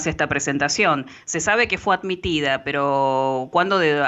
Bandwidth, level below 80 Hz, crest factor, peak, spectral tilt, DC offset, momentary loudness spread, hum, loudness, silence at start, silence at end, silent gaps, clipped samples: 8.4 kHz; -48 dBFS; 16 dB; -6 dBFS; -3.5 dB/octave; under 0.1%; 4 LU; none; -20 LUFS; 0 s; 0 s; none; under 0.1%